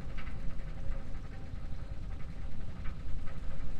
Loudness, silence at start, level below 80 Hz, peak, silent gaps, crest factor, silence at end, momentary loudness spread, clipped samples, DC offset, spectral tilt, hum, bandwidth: -45 LUFS; 0 s; -40 dBFS; -20 dBFS; none; 12 dB; 0 s; 2 LU; under 0.1%; under 0.1%; -7 dB/octave; none; 5 kHz